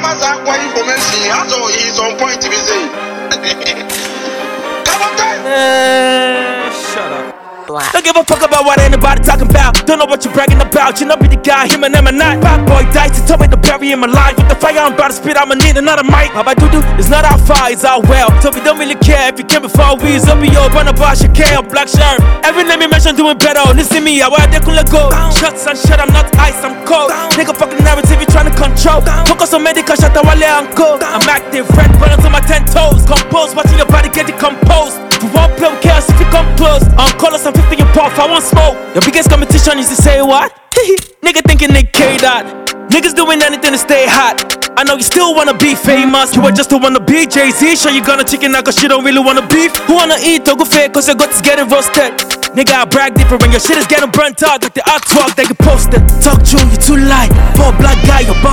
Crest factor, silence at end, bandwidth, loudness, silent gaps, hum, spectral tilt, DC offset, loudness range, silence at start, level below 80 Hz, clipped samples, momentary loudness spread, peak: 8 dB; 0 s; over 20 kHz; -8 LUFS; none; none; -4 dB/octave; under 0.1%; 3 LU; 0 s; -12 dBFS; 5%; 5 LU; 0 dBFS